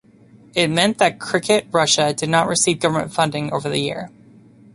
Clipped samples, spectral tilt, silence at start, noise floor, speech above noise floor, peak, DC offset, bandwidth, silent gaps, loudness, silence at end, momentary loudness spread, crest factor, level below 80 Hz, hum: under 0.1%; -3.5 dB/octave; 0.55 s; -48 dBFS; 30 dB; -2 dBFS; under 0.1%; 11.5 kHz; none; -18 LUFS; 0.65 s; 8 LU; 18 dB; -56 dBFS; none